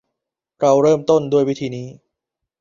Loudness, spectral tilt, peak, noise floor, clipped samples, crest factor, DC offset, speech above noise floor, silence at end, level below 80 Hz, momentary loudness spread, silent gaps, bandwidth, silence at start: -17 LUFS; -6.5 dB/octave; -2 dBFS; -81 dBFS; under 0.1%; 16 dB; under 0.1%; 65 dB; 0.7 s; -60 dBFS; 15 LU; none; 7.4 kHz; 0.6 s